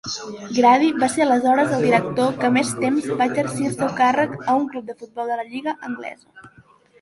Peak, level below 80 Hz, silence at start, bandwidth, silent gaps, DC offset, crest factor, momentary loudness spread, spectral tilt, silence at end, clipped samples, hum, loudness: -2 dBFS; -60 dBFS; 0.05 s; 11.5 kHz; none; under 0.1%; 18 dB; 13 LU; -5 dB/octave; 0.55 s; under 0.1%; none; -20 LUFS